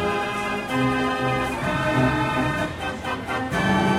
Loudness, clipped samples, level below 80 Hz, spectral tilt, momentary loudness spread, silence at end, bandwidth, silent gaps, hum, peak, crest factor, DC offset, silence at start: -23 LUFS; under 0.1%; -42 dBFS; -5.5 dB/octave; 6 LU; 0 s; 16 kHz; none; none; -8 dBFS; 14 dB; under 0.1%; 0 s